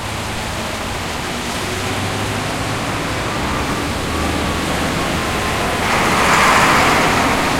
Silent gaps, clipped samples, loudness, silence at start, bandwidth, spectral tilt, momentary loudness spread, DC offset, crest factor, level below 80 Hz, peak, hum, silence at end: none; under 0.1%; -17 LUFS; 0 s; 16.5 kHz; -3.5 dB/octave; 11 LU; under 0.1%; 18 dB; -32 dBFS; 0 dBFS; none; 0 s